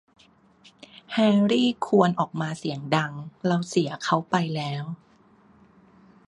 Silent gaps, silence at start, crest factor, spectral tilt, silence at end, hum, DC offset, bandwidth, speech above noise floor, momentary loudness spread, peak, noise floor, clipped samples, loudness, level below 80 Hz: none; 0.95 s; 22 dB; -6 dB/octave; 1.35 s; none; under 0.1%; 11 kHz; 34 dB; 11 LU; -4 dBFS; -57 dBFS; under 0.1%; -24 LUFS; -68 dBFS